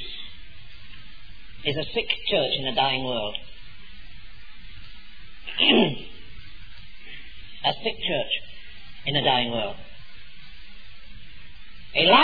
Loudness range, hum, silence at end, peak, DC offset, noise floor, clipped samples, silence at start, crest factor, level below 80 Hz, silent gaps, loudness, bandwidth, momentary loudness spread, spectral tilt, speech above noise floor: 4 LU; none; 0 s; -4 dBFS; 2%; -46 dBFS; under 0.1%; 0 s; 22 dB; -48 dBFS; none; -24 LUFS; 5 kHz; 26 LU; -7 dB/octave; 23 dB